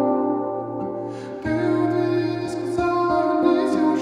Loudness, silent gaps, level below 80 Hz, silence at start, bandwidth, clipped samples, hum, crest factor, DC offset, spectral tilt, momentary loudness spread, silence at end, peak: -22 LUFS; none; -52 dBFS; 0 s; 10.5 kHz; under 0.1%; none; 14 dB; under 0.1%; -7.5 dB/octave; 10 LU; 0 s; -6 dBFS